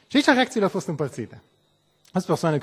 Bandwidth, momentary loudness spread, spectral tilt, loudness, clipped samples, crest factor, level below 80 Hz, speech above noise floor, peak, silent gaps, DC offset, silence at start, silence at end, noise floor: 16 kHz; 13 LU; -5 dB/octave; -23 LUFS; under 0.1%; 22 dB; -64 dBFS; 43 dB; -2 dBFS; none; under 0.1%; 0.1 s; 0 s; -65 dBFS